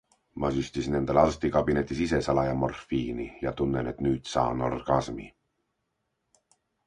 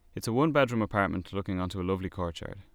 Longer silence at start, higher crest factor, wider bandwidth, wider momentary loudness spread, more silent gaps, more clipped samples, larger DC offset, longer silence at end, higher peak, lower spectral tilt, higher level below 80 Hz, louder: first, 0.35 s vs 0.15 s; about the same, 22 dB vs 20 dB; second, 10.5 kHz vs 18.5 kHz; about the same, 9 LU vs 10 LU; neither; neither; neither; first, 1.6 s vs 0.1 s; first, -6 dBFS vs -10 dBFS; about the same, -6.5 dB/octave vs -6.5 dB/octave; first, -46 dBFS vs -52 dBFS; about the same, -28 LUFS vs -30 LUFS